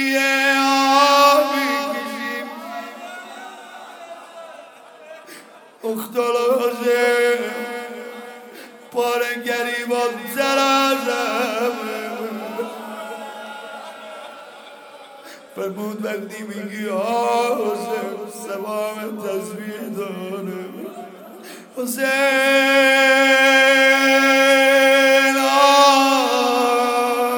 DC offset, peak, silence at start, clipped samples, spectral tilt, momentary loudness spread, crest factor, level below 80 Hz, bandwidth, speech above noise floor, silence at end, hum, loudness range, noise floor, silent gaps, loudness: under 0.1%; -2 dBFS; 0 s; under 0.1%; -2 dB/octave; 23 LU; 16 dB; -80 dBFS; 19 kHz; 25 dB; 0 s; none; 19 LU; -43 dBFS; none; -17 LUFS